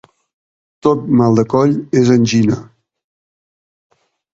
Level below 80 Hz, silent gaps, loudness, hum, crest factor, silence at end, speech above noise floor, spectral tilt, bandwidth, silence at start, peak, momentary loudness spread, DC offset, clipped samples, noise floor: -50 dBFS; none; -14 LUFS; none; 16 dB; 1.7 s; over 78 dB; -7 dB/octave; 7.8 kHz; 0.85 s; 0 dBFS; 6 LU; under 0.1%; under 0.1%; under -90 dBFS